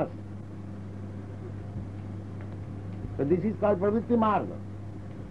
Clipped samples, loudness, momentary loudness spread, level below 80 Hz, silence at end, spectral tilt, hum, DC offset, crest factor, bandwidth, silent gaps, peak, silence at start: under 0.1%; -31 LUFS; 16 LU; -52 dBFS; 0 s; -9.5 dB/octave; 50 Hz at -40 dBFS; 0.3%; 18 dB; 7.8 kHz; none; -12 dBFS; 0 s